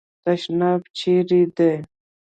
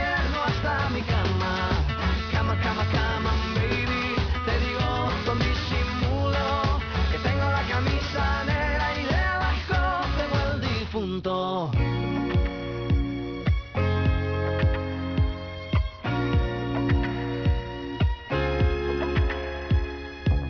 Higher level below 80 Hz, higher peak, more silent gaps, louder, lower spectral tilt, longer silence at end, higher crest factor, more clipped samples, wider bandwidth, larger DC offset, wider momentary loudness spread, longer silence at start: second, -64 dBFS vs -30 dBFS; first, -6 dBFS vs -12 dBFS; first, 0.90-0.94 s vs none; first, -20 LUFS vs -26 LUFS; about the same, -7.5 dB/octave vs -7 dB/octave; first, 0.4 s vs 0 s; about the same, 14 dB vs 12 dB; neither; first, 8.6 kHz vs 5.4 kHz; neither; first, 7 LU vs 3 LU; first, 0.25 s vs 0 s